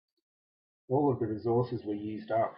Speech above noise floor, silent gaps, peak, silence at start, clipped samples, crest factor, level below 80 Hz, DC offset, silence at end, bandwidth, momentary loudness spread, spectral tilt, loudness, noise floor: over 60 dB; none; -16 dBFS; 0.9 s; under 0.1%; 16 dB; -74 dBFS; under 0.1%; 0 s; 5.6 kHz; 8 LU; -12 dB/octave; -32 LUFS; under -90 dBFS